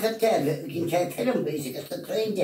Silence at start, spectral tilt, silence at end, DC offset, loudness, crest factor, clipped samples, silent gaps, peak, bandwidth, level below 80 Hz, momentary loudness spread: 0 s; -5.5 dB/octave; 0 s; under 0.1%; -27 LUFS; 16 dB; under 0.1%; none; -12 dBFS; 16 kHz; -70 dBFS; 9 LU